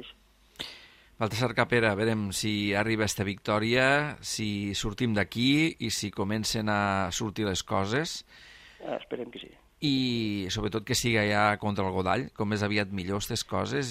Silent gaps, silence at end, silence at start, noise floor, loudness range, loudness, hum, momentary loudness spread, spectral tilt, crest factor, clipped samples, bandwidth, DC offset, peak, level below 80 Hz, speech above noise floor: none; 0 s; 0 s; -57 dBFS; 5 LU; -28 LUFS; none; 12 LU; -4.5 dB/octave; 20 dB; under 0.1%; 15.5 kHz; under 0.1%; -8 dBFS; -54 dBFS; 29 dB